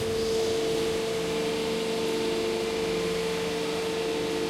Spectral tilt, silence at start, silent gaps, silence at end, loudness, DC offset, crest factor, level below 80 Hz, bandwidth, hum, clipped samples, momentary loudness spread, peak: -4 dB/octave; 0 s; none; 0 s; -28 LUFS; under 0.1%; 12 dB; -52 dBFS; 16 kHz; none; under 0.1%; 2 LU; -16 dBFS